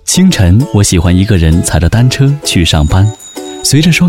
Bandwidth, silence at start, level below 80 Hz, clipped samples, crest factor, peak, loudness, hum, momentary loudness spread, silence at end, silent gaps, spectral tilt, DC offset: 16.5 kHz; 0.05 s; -20 dBFS; under 0.1%; 8 dB; 0 dBFS; -9 LUFS; none; 5 LU; 0 s; none; -5 dB/octave; under 0.1%